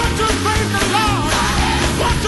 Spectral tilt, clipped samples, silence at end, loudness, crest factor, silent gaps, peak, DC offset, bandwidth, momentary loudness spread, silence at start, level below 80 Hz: -4 dB/octave; under 0.1%; 0 s; -16 LUFS; 12 dB; none; -4 dBFS; under 0.1%; 12 kHz; 1 LU; 0 s; -24 dBFS